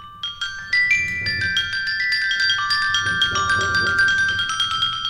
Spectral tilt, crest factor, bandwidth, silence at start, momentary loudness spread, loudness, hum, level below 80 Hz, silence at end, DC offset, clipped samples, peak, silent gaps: -1 dB/octave; 16 dB; 14.5 kHz; 0 s; 5 LU; -18 LUFS; none; -46 dBFS; 0 s; under 0.1%; under 0.1%; -6 dBFS; none